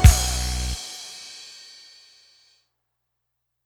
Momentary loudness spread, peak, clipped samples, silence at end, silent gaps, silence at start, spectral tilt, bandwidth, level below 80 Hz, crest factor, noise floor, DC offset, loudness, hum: 22 LU; 0 dBFS; under 0.1%; 2.25 s; none; 0 s; -3.5 dB/octave; 18 kHz; -26 dBFS; 22 dB; -77 dBFS; under 0.1%; -25 LUFS; none